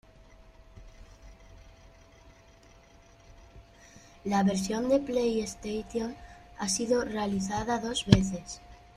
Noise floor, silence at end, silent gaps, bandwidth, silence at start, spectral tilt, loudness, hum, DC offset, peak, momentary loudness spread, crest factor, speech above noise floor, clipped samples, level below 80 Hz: -56 dBFS; 0.2 s; none; 13.5 kHz; 0.4 s; -5 dB/octave; -29 LUFS; none; under 0.1%; -2 dBFS; 16 LU; 30 dB; 28 dB; under 0.1%; -50 dBFS